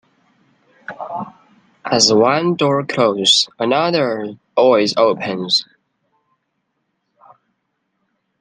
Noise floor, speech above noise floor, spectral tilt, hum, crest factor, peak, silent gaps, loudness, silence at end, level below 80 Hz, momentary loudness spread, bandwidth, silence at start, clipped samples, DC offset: -71 dBFS; 56 dB; -3.5 dB/octave; none; 18 dB; 0 dBFS; none; -15 LUFS; 2.8 s; -64 dBFS; 18 LU; 10 kHz; 0.9 s; under 0.1%; under 0.1%